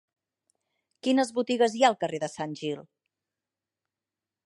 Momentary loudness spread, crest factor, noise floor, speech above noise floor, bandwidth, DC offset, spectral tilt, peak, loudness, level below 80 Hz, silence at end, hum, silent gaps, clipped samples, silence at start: 12 LU; 22 dB; under -90 dBFS; over 64 dB; 11.5 kHz; under 0.1%; -4 dB/octave; -8 dBFS; -27 LUFS; -80 dBFS; 1.65 s; none; none; under 0.1%; 1.05 s